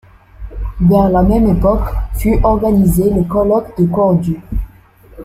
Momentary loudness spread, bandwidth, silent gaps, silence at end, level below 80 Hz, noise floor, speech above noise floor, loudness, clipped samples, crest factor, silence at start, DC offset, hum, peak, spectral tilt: 14 LU; 15.5 kHz; none; 0 s; -22 dBFS; -42 dBFS; 30 dB; -13 LUFS; under 0.1%; 12 dB; 0.4 s; under 0.1%; none; -2 dBFS; -9 dB/octave